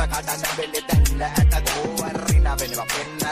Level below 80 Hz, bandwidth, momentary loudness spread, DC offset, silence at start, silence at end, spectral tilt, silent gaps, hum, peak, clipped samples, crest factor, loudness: -24 dBFS; 16 kHz; 6 LU; under 0.1%; 0 s; 0 s; -4 dB/octave; none; none; -6 dBFS; under 0.1%; 14 dB; -22 LUFS